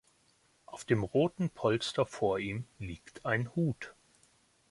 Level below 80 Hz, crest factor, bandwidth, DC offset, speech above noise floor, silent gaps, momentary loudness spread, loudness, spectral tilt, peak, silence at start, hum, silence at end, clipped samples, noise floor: -60 dBFS; 20 dB; 11.5 kHz; under 0.1%; 37 dB; none; 14 LU; -33 LUFS; -6 dB/octave; -14 dBFS; 0.7 s; none; 0.8 s; under 0.1%; -69 dBFS